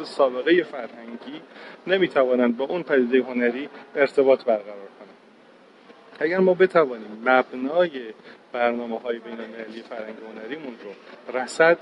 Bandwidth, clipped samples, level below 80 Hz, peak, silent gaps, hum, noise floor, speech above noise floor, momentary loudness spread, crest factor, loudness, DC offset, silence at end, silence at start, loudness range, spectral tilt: 11 kHz; under 0.1%; -74 dBFS; -6 dBFS; none; none; -52 dBFS; 29 dB; 19 LU; 18 dB; -22 LUFS; under 0.1%; 0 s; 0 s; 7 LU; -5.5 dB/octave